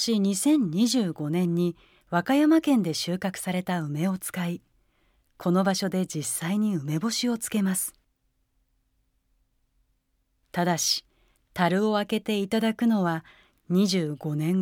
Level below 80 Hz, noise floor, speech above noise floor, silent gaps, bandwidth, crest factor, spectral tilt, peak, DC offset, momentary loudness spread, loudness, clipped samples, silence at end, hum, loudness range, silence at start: -66 dBFS; -73 dBFS; 48 dB; none; 18.5 kHz; 20 dB; -5 dB/octave; -6 dBFS; under 0.1%; 8 LU; -26 LUFS; under 0.1%; 0 s; none; 7 LU; 0 s